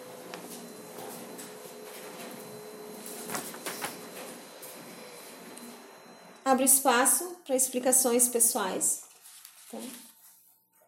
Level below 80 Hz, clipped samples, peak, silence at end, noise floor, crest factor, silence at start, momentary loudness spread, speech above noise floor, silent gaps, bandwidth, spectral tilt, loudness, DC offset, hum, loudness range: -86 dBFS; under 0.1%; -8 dBFS; 0.8 s; -63 dBFS; 24 dB; 0 s; 23 LU; 37 dB; none; 16.5 kHz; -1 dB/octave; -25 LUFS; under 0.1%; none; 16 LU